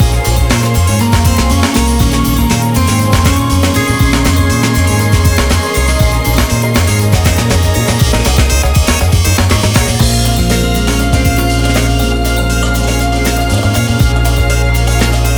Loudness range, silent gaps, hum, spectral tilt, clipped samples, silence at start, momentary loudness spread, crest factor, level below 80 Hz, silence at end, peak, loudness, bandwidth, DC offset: 1 LU; none; none; -4.5 dB/octave; under 0.1%; 0 s; 2 LU; 10 dB; -16 dBFS; 0 s; 0 dBFS; -11 LUFS; over 20 kHz; under 0.1%